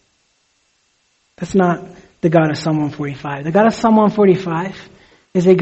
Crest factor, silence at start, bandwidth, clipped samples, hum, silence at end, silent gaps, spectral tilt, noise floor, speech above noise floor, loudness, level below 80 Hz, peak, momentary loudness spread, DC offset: 16 dB; 1.4 s; 8.2 kHz; under 0.1%; none; 0 s; none; -7.5 dB/octave; -62 dBFS; 48 dB; -16 LUFS; -52 dBFS; 0 dBFS; 12 LU; under 0.1%